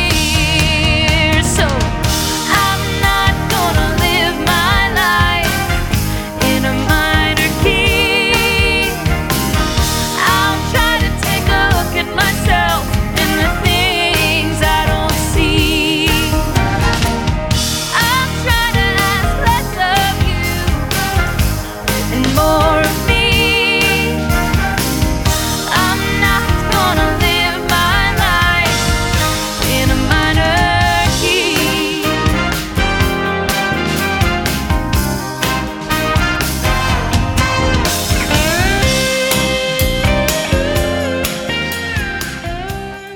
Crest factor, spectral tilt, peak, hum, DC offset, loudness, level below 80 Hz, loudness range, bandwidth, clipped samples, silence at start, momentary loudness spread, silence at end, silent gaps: 14 dB; -4 dB/octave; 0 dBFS; none; under 0.1%; -14 LUFS; -22 dBFS; 3 LU; 19 kHz; under 0.1%; 0 s; 5 LU; 0 s; none